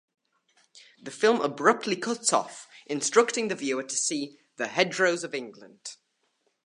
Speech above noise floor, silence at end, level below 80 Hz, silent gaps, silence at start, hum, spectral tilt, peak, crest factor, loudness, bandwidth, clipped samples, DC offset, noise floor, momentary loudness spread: 47 dB; 0.7 s; -82 dBFS; none; 0.75 s; none; -2.5 dB/octave; -6 dBFS; 24 dB; -26 LUFS; 11.5 kHz; under 0.1%; under 0.1%; -74 dBFS; 19 LU